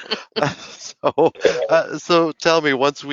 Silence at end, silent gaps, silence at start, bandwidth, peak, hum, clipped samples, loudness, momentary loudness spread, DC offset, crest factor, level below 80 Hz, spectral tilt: 0 s; none; 0 s; 7.8 kHz; 0 dBFS; none; under 0.1%; -18 LUFS; 8 LU; under 0.1%; 18 dB; -60 dBFS; -2.5 dB/octave